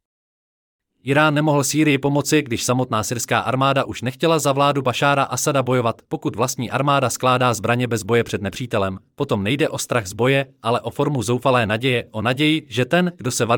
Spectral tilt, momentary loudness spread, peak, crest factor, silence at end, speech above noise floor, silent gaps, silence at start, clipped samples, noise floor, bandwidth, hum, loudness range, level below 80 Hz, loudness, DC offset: -4.5 dB/octave; 6 LU; -4 dBFS; 16 dB; 0 s; over 71 dB; none; 1.05 s; under 0.1%; under -90 dBFS; 18.5 kHz; none; 2 LU; -58 dBFS; -19 LUFS; under 0.1%